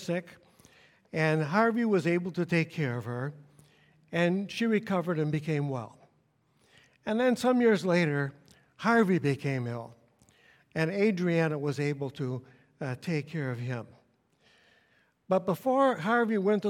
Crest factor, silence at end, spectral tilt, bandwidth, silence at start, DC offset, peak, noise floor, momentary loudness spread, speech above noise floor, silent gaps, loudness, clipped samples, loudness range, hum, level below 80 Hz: 20 dB; 0 s; -7 dB/octave; 16 kHz; 0 s; under 0.1%; -10 dBFS; -70 dBFS; 12 LU; 41 dB; none; -29 LUFS; under 0.1%; 6 LU; none; -72 dBFS